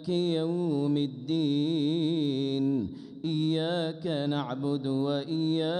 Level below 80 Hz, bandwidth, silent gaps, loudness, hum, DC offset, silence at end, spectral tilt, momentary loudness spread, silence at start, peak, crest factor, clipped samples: -70 dBFS; 9.8 kHz; none; -29 LUFS; none; under 0.1%; 0 s; -7.5 dB/octave; 4 LU; 0 s; -18 dBFS; 10 dB; under 0.1%